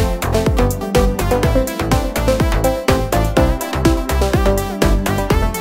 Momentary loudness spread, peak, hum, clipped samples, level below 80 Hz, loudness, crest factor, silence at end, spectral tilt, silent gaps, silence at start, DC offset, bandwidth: 2 LU; 0 dBFS; none; under 0.1%; -20 dBFS; -17 LUFS; 16 dB; 0 s; -5.5 dB/octave; none; 0 s; under 0.1%; 16.5 kHz